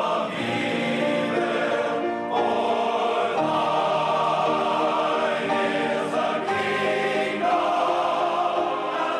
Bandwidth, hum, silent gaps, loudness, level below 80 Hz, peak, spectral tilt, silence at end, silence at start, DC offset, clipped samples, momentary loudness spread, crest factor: 12 kHz; none; none; -23 LUFS; -70 dBFS; -10 dBFS; -5 dB/octave; 0 s; 0 s; under 0.1%; under 0.1%; 3 LU; 12 dB